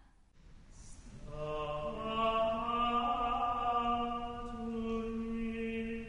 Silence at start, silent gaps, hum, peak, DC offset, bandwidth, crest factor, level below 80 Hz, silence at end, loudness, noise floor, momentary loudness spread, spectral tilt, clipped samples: 0.35 s; none; none; -22 dBFS; under 0.1%; 10.5 kHz; 14 dB; -50 dBFS; 0 s; -35 LUFS; -60 dBFS; 12 LU; -6 dB/octave; under 0.1%